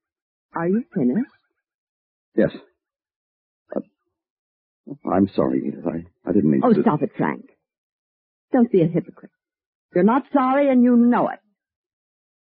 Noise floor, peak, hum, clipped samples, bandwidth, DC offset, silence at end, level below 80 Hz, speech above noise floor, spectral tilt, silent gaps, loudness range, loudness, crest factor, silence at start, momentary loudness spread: -63 dBFS; -4 dBFS; none; under 0.1%; 4.5 kHz; under 0.1%; 1.1 s; -62 dBFS; 44 dB; -8 dB/octave; 1.74-2.32 s, 3.16-3.66 s, 4.30-4.84 s, 7.78-8.48 s, 9.66-9.89 s; 10 LU; -20 LUFS; 18 dB; 0.55 s; 16 LU